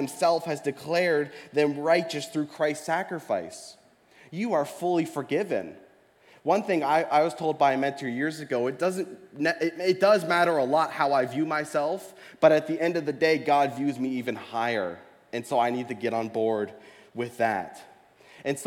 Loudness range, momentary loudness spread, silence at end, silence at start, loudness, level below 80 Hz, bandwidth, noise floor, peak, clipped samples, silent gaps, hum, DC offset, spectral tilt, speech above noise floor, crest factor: 5 LU; 13 LU; 0 s; 0 s; -26 LUFS; -78 dBFS; 17 kHz; -58 dBFS; -6 dBFS; under 0.1%; none; none; under 0.1%; -5 dB/octave; 32 dB; 20 dB